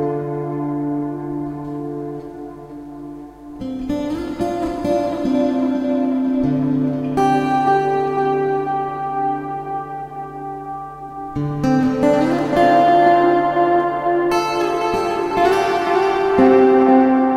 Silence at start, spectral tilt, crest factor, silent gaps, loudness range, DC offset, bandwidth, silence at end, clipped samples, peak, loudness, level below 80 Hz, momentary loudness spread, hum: 0 s; -7 dB/octave; 16 dB; none; 11 LU; under 0.1%; 14 kHz; 0 s; under 0.1%; 0 dBFS; -18 LUFS; -46 dBFS; 17 LU; none